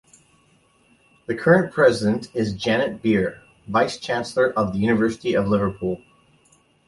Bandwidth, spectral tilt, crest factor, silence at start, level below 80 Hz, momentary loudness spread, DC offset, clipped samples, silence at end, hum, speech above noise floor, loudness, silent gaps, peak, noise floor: 11.5 kHz; -6 dB/octave; 20 dB; 1.3 s; -52 dBFS; 11 LU; under 0.1%; under 0.1%; 0.9 s; none; 39 dB; -21 LUFS; none; -2 dBFS; -59 dBFS